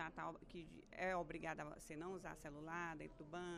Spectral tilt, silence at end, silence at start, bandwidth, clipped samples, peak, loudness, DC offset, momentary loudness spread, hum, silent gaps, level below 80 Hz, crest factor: -5 dB/octave; 0 s; 0 s; 14 kHz; under 0.1%; -32 dBFS; -50 LUFS; under 0.1%; 12 LU; none; none; -68 dBFS; 18 dB